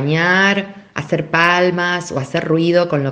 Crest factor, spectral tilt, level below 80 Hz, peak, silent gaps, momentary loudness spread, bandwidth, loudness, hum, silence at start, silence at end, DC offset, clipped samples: 16 dB; -5.5 dB/octave; -56 dBFS; 0 dBFS; none; 9 LU; 9.6 kHz; -15 LUFS; none; 0 s; 0 s; under 0.1%; under 0.1%